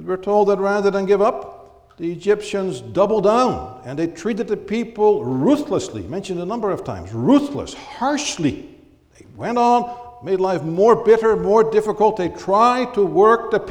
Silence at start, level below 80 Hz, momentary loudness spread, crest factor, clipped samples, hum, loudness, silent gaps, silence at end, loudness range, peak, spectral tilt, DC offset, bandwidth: 0 s; -50 dBFS; 14 LU; 16 dB; under 0.1%; none; -18 LUFS; none; 0 s; 5 LU; -2 dBFS; -6 dB/octave; under 0.1%; 11 kHz